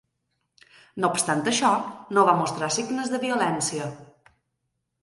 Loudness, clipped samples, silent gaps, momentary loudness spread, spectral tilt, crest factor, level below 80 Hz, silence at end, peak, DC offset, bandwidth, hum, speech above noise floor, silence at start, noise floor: -24 LUFS; under 0.1%; none; 7 LU; -3.5 dB/octave; 22 dB; -68 dBFS; 1 s; -4 dBFS; under 0.1%; 11.5 kHz; none; 54 dB; 0.95 s; -78 dBFS